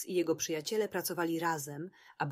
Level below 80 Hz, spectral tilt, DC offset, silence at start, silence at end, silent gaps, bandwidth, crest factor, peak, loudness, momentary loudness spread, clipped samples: -78 dBFS; -4 dB/octave; under 0.1%; 0 s; 0 s; none; 16 kHz; 16 dB; -18 dBFS; -34 LUFS; 10 LU; under 0.1%